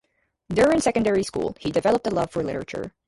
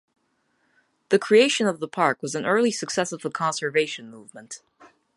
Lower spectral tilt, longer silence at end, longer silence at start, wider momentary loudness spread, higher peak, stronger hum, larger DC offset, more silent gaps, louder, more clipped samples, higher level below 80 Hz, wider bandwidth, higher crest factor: first, -5.5 dB/octave vs -3.5 dB/octave; second, 0.2 s vs 0.6 s; second, 0.5 s vs 1.1 s; second, 10 LU vs 22 LU; second, -8 dBFS vs -4 dBFS; neither; neither; neither; about the same, -23 LUFS vs -23 LUFS; neither; first, -50 dBFS vs -74 dBFS; about the same, 11.5 kHz vs 11.5 kHz; about the same, 16 dB vs 20 dB